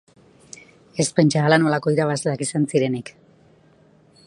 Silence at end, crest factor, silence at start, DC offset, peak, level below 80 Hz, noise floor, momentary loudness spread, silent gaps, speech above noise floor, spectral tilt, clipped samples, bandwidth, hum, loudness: 1.15 s; 22 dB; 0.95 s; under 0.1%; 0 dBFS; -62 dBFS; -54 dBFS; 15 LU; none; 35 dB; -5.5 dB/octave; under 0.1%; 11.5 kHz; none; -20 LUFS